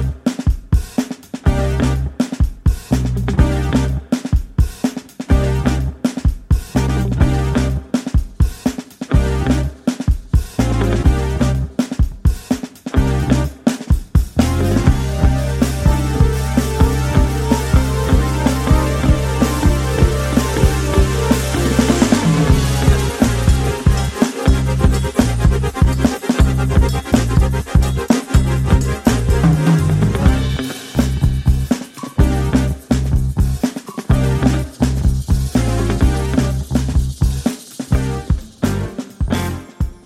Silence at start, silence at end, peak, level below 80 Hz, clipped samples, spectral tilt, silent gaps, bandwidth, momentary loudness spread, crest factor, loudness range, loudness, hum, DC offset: 0 s; 0.1 s; 0 dBFS; -20 dBFS; under 0.1%; -6.5 dB/octave; none; 15.5 kHz; 6 LU; 14 dB; 3 LU; -17 LUFS; none; under 0.1%